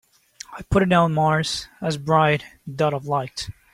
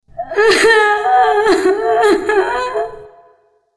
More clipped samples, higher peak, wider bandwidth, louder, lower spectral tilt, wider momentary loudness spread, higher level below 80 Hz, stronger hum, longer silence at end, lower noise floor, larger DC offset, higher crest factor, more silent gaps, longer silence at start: neither; second, -4 dBFS vs 0 dBFS; first, 15 kHz vs 11 kHz; second, -21 LUFS vs -13 LUFS; first, -5.5 dB/octave vs -2.5 dB/octave; first, 18 LU vs 11 LU; about the same, -44 dBFS vs -46 dBFS; neither; second, 0.25 s vs 0.7 s; second, -44 dBFS vs -53 dBFS; neither; about the same, 18 dB vs 14 dB; neither; first, 0.5 s vs 0.15 s